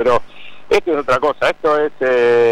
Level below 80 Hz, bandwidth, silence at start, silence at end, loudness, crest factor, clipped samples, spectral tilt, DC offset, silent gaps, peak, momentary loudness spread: -46 dBFS; 11.5 kHz; 0 s; 0 s; -16 LUFS; 10 dB; under 0.1%; -5 dB/octave; under 0.1%; none; -6 dBFS; 5 LU